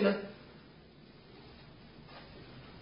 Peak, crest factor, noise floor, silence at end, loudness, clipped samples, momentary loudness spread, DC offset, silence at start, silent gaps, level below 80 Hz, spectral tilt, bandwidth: -16 dBFS; 24 dB; -57 dBFS; 0 s; -43 LUFS; under 0.1%; 16 LU; under 0.1%; 0 s; none; -64 dBFS; -5 dB/octave; 5.2 kHz